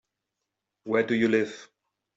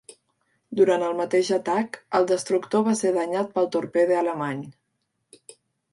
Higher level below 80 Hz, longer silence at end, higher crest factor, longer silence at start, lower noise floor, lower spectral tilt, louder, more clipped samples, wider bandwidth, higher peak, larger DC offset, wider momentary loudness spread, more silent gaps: about the same, -72 dBFS vs -74 dBFS; second, 0.5 s vs 1.2 s; about the same, 18 dB vs 18 dB; first, 0.85 s vs 0.7 s; first, -84 dBFS vs -76 dBFS; about the same, -6 dB/octave vs -5 dB/octave; second, -26 LUFS vs -23 LUFS; neither; second, 7.8 kHz vs 11.5 kHz; second, -10 dBFS vs -6 dBFS; neither; first, 22 LU vs 8 LU; neither